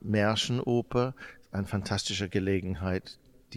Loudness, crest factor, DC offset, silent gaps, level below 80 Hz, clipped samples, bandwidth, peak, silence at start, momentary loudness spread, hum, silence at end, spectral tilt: -30 LUFS; 16 dB; under 0.1%; none; -54 dBFS; under 0.1%; 14 kHz; -14 dBFS; 0.05 s; 10 LU; none; 0 s; -5 dB/octave